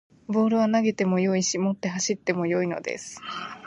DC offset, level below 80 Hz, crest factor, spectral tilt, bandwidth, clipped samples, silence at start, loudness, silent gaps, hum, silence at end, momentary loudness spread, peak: under 0.1%; -68 dBFS; 18 dB; -5 dB/octave; 10.5 kHz; under 0.1%; 0.3 s; -25 LUFS; none; none; 0 s; 12 LU; -8 dBFS